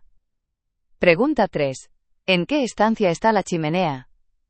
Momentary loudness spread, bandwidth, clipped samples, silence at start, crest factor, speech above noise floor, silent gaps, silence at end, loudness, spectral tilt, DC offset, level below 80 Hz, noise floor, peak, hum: 8 LU; 8.8 kHz; under 0.1%; 1 s; 22 dB; 56 dB; none; 0.5 s; -20 LUFS; -5.5 dB/octave; under 0.1%; -52 dBFS; -76 dBFS; 0 dBFS; none